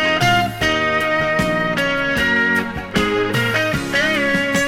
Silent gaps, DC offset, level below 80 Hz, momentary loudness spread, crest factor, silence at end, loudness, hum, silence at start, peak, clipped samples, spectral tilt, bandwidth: none; under 0.1%; -40 dBFS; 3 LU; 14 dB; 0 s; -17 LUFS; none; 0 s; -2 dBFS; under 0.1%; -4.5 dB/octave; 17.5 kHz